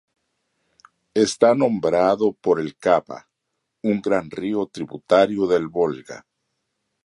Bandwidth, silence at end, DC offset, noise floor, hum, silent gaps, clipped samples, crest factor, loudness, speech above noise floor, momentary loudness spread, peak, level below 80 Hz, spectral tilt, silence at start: 11 kHz; 0.85 s; under 0.1%; -78 dBFS; none; none; under 0.1%; 20 dB; -20 LUFS; 58 dB; 16 LU; -2 dBFS; -60 dBFS; -5.5 dB/octave; 1.15 s